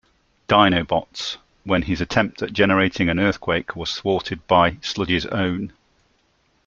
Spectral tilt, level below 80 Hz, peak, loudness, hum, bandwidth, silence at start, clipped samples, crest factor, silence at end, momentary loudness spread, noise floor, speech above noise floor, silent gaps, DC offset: -5.5 dB/octave; -46 dBFS; -2 dBFS; -20 LUFS; none; 7.6 kHz; 0.5 s; under 0.1%; 20 dB; 0.95 s; 11 LU; -64 dBFS; 44 dB; none; under 0.1%